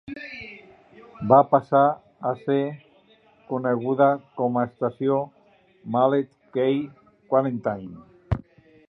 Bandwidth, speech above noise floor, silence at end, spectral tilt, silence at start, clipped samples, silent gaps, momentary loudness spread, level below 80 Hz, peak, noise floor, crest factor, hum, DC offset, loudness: 5.4 kHz; 35 dB; 0.5 s; -10 dB/octave; 0.1 s; under 0.1%; none; 18 LU; -50 dBFS; -4 dBFS; -57 dBFS; 22 dB; none; under 0.1%; -23 LUFS